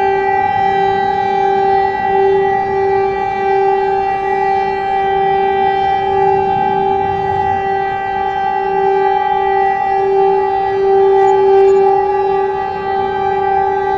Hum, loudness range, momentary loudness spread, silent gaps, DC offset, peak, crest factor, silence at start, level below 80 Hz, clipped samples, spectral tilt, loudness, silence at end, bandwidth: none; 3 LU; 6 LU; none; under 0.1%; -2 dBFS; 10 dB; 0 s; -42 dBFS; under 0.1%; -6.5 dB/octave; -14 LUFS; 0 s; 7.2 kHz